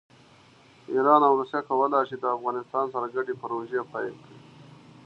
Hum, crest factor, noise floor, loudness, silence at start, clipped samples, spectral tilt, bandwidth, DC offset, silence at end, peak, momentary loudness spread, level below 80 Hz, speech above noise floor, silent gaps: none; 22 dB; -55 dBFS; -26 LUFS; 0.9 s; under 0.1%; -7.5 dB/octave; 6.8 kHz; under 0.1%; 0.65 s; -6 dBFS; 12 LU; -76 dBFS; 30 dB; none